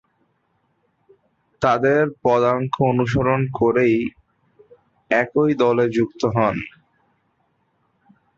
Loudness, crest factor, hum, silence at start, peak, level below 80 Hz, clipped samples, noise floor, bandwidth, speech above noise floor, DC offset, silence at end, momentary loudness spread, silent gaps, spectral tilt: -19 LUFS; 18 dB; none; 1.6 s; -4 dBFS; -50 dBFS; under 0.1%; -67 dBFS; 7.6 kHz; 49 dB; under 0.1%; 1.7 s; 5 LU; none; -7.5 dB/octave